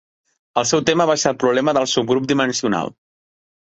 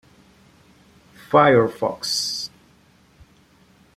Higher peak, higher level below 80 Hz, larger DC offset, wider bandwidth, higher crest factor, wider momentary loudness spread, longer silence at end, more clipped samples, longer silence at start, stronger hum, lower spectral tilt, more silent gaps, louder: about the same, -2 dBFS vs -2 dBFS; about the same, -58 dBFS vs -60 dBFS; neither; second, 8.2 kHz vs 15.5 kHz; about the same, 18 dB vs 22 dB; second, 6 LU vs 13 LU; second, 0.85 s vs 1.5 s; neither; second, 0.55 s vs 1.3 s; neither; about the same, -3.5 dB/octave vs -4 dB/octave; neither; about the same, -18 LUFS vs -19 LUFS